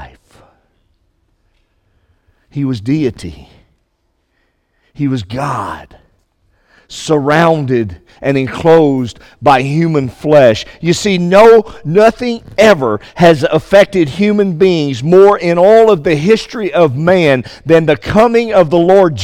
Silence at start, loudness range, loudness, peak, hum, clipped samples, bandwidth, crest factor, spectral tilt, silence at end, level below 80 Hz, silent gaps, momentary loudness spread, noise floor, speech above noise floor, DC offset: 0 s; 13 LU; -10 LUFS; 0 dBFS; none; 0.5%; 15.5 kHz; 12 dB; -6.5 dB/octave; 0 s; -42 dBFS; none; 12 LU; -62 dBFS; 52 dB; under 0.1%